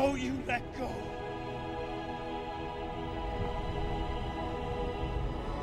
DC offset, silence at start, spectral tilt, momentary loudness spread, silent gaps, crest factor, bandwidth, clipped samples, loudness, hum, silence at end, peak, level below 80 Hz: under 0.1%; 0 s; -6.5 dB/octave; 4 LU; none; 18 dB; 13 kHz; under 0.1%; -37 LUFS; none; 0 s; -16 dBFS; -42 dBFS